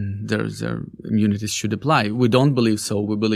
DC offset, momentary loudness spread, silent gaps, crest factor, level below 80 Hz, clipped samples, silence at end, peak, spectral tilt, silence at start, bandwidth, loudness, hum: under 0.1%; 9 LU; none; 18 dB; -54 dBFS; under 0.1%; 0 s; -2 dBFS; -5.5 dB/octave; 0 s; 15 kHz; -21 LUFS; none